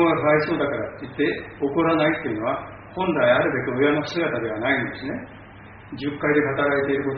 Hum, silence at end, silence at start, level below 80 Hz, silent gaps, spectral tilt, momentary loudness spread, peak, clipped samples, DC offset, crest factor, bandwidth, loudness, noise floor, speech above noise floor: none; 0 s; 0 s; -52 dBFS; none; -4.5 dB/octave; 13 LU; -4 dBFS; under 0.1%; under 0.1%; 18 dB; 4.8 kHz; -22 LUFS; -43 dBFS; 21 dB